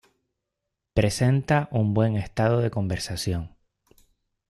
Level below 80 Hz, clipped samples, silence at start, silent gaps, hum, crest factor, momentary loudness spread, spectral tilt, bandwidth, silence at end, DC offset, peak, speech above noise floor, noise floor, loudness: -46 dBFS; under 0.1%; 0.95 s; none; none; 18 dB; 7 LU; -6.5 dB/octave; 13.5 kHz; 1 s; under 0.1%; -6 dBFS; 60 dB; -83 dBFS; -25 LUFS